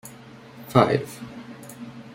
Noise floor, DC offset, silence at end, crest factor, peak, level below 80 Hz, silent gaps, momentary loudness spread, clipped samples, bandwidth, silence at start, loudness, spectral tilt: -45 dBFS; under 0.1%; 0.1 s; 24 dB; -2 dBFS; -58 dBFS; none; 24 LU; under 0.1%; 16.5 kHz; 0.05 s; -21 LUFS; -6.5 dB/octave